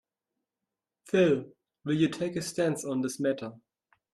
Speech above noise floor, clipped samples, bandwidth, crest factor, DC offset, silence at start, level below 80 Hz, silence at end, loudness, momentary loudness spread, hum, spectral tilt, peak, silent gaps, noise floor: 60 dB; under 0.1%; 13.5 kHz; 18 dB; under 0.1%; 1.05 s; -70 dBFS; 0.6 s; -29 LUFS; 10 LU; none; -5.5 dB/octave; -14 dBFS; none; -89 dBFS